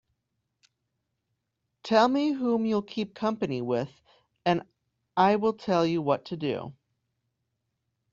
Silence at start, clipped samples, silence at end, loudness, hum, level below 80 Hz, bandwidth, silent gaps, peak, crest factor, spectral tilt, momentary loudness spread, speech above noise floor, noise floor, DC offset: 1.85 s; under 0.1%; 1.4 s; -27 LUFS; none; -68 dBFS; 7.6 kHz; none; -8 dBFS; 22 dB; -5 dB/octave; 11 LU; 55 dB; -81 dBFS; under 0.1%